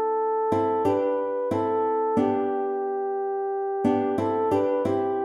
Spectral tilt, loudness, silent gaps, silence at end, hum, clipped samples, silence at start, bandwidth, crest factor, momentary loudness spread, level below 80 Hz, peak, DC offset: -8 dB/octave; -25 LUFS; none; 0 s; none; under 0.1%; 0 s; 12 kHz; 14 dB; 4 LU; -64 dBFS; -10 dBFS; under 0.1%